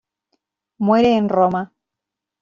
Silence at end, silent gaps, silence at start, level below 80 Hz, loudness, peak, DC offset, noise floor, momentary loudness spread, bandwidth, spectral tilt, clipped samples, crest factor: 0.75 s; none; 0.8 s; -58 dBFS; -17 LUFS; -4 dBFS; under 0.1%; -84 dBFS; 11 LU; 7.2 kHz; -7.5 dB/octave; under 0.1%; 16 dB